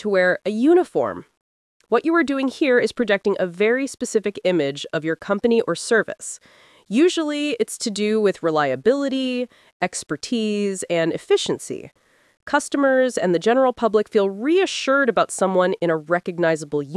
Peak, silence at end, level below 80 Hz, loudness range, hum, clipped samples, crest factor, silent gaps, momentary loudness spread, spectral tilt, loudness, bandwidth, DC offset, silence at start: -4 dBFS; 0 s; -66 dBFS; 3 LU; none; under 0.1%; 16 dB; 1.37-1.80 s, 9.73-9.80 s; 8 LU; -4.5 dB/octave; -20 LUFS; 12 kHz; under 0.1%; 0 s